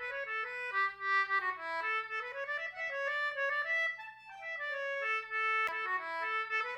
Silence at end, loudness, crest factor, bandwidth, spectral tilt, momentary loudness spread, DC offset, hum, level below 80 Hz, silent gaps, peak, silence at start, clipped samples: 0 s; -34 LUFS; 14 dB; 16 kHz; -1 dB/octave; 7 LU; under 0.1%; none; -80 dBFS; none; -22 dBFS; 0 s; under 0.1%